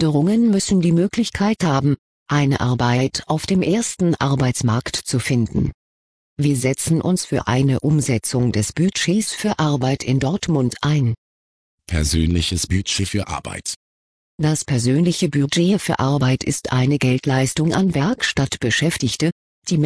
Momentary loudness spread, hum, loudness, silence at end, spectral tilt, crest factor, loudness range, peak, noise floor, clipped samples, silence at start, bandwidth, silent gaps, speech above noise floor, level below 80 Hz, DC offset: 6 LU; none; -19 LUFS; 0 s; -5 dB/octave; 14 dB; 3 LU; -4 dBFS; under -90 dBFS; under 0.1%; 0 s; 11 kHz; 1.98-2.26 s, 5.74-6.36 s, 11.18-11.78 s, 13.76-14.38 s, 19.32-19.62 s; over 72 dB; -38 dBFS; 0.1%